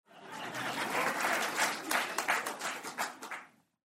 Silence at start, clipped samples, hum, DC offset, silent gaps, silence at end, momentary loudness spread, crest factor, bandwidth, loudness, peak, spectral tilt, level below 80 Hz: 0.1 s; under 0.1%; none; under 0.1%; none; 0.5 s; 13 LU; 20 dB; 16 kHz; -34 LUFS; -16 dBFS; -1 dB/octave; -82 dBFS